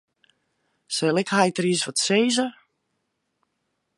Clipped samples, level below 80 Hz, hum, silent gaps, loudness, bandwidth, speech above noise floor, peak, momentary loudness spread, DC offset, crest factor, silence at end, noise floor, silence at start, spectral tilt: under 0.1%; -74 dBFS; none; none; -22 LUFS; 11.5 kHz; 54 dB; -4 dBFS; 6 LU; under 0.1%; 20 dB; 1.45 s; -76 dBFS; 0.9 s; -3.5 dB/octave